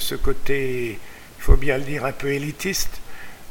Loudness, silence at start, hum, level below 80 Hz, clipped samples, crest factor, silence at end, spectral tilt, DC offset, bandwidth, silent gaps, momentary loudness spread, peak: -25 LUFS; 0 s; none; -26 dBFS; under 0.1%; 20 dB; 0 s; -4.5 dB/octave; under 0.1%; 17.5 kHz; none; 18 LU; 0 dBFS